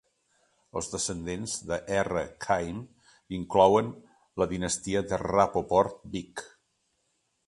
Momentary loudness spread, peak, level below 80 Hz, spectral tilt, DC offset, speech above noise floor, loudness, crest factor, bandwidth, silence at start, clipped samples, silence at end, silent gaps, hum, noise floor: 16 LU; -6 dBFS; -54 dBFS; -4.5 dB/octave; under 0.1%; 48 dB; -28 LUFS; 22 dB; 11.5 kHz; 0.75 s; under 0.1%; 1 s; none; none; -75 dBFS